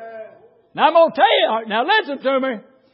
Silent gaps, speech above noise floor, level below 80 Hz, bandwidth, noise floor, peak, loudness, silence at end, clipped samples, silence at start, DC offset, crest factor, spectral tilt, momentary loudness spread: none; 31 dB; -78 dBFS; 5.6 kHz; -47 dBFS; -2 dBFS; -17 LUFS; 0.35 s; under 0.1%; 0 s; under 0.1%; 16 dB; -8.5 dB/octave; 20 LU